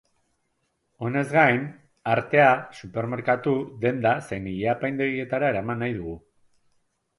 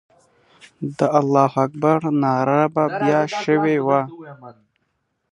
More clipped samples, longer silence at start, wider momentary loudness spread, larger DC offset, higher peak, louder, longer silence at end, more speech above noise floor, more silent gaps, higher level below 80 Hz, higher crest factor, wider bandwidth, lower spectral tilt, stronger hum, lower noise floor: neither; first, 1 s vs 0.8 s; about the same, 15 LU vs 14 LU; neither; second, -6 dBFS vs -2 dBFS; second, -24 LUFS vs -19 LUFS; first, 1 s vs 0.8 s; about the same, 50 dB vs 53 dB; neither; first, -56 dBFS vs -66 dBFS; about the same, 20 dB vs 18 dB; about the same, 11.5 kHz vs 10.5 kHz; about the same, -7.5 dB/octave vs -7.5 dB/octave; neither; about the same, -74 dBFS vs -71 dBFS